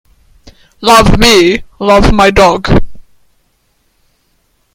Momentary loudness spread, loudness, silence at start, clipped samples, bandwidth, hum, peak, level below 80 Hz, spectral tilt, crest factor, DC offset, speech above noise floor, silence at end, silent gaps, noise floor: 7 LU; -7 LUFS; 0.8 s; 2%; 20 kHz; none; 0 dBFS; -20 dBFS; -4.5 dB/octave; 10 dB; under 0.1%; 50 dB; 1.75 s; none; -56 dBFS